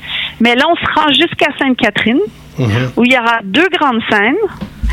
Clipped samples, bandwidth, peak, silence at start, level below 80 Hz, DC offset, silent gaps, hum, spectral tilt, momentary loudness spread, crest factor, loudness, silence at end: under 0.1%; 15.5 kHz; 0 dBFS; 0 s; -32 dBFS; under 0.1%; none; none; -5.5 dB/octave; 8 LU; 12 dB; -12 LUFS; 0 s